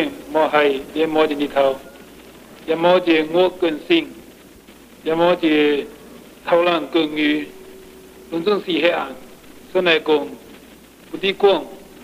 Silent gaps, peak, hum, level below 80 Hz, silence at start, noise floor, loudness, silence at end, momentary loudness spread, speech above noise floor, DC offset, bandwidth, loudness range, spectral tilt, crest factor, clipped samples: none; -2 dBFS; none; -56 dBFS; 0 s; -44 dBFS; -18 LUFS; 0.2 s; 16 LU; 27 dB; under 0.1%; 15.5 kHz; 3 LU; -5 dB/octave; 18 dB; under 0.1%